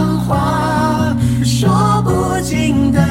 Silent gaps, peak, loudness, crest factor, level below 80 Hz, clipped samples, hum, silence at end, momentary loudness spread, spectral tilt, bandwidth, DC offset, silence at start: none; -2 dBFS; -14 LUFS; 12 dB; -30 dBFS; under 0.1%; none; 0 s; 3 LU; -6 dB/octave; 16.5 kHz; under 0.1%; 0 s